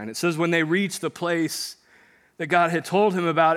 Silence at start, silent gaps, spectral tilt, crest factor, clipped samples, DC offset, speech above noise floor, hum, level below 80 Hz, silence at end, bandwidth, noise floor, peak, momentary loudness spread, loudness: 0 s; none; -5 dB/octave; 18 dB; under 0.1%; under 0.1%; 34 dB; none; -78 dBFS; 0 s; 16 kHz; -57 dBFS; -4 dBFS; 8 LU; -23 LUFS